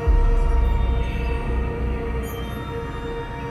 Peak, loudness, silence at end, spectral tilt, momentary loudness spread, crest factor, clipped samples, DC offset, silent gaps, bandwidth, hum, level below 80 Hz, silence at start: -8 dBFS; -25 LUFS; 0 s; -7.5 dB/octave; 8 LU; 14 dB; under 0.1%; under 0.1%; none; 13.5 kHz; none; -22 dBFS; 0 s